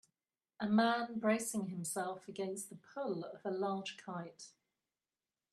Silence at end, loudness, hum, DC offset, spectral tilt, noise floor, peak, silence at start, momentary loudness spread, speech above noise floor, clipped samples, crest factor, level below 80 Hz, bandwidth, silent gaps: 1.05 s; -38 LUFS; none; under 0.1%; -4.5 dB/octave; under -90 dBFS; -18 dBFS; 0.6 s; 14 LU; over 52 dB; under 0.1%; 20 dB; -82 dBFS; 13.5 kHz; none